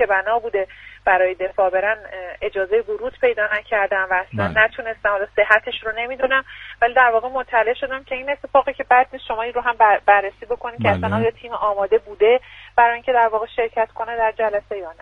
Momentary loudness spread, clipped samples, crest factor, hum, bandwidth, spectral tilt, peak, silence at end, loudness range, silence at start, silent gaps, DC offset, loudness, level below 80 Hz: 10 LU; under 0.1%; 18 dB; none; 6.4 kHz; -7 dB/octave; 0 dBFS; 0.1 s; 2 LU; 0 s; none; under 0.1%; -19 LUFS; -50 dBFS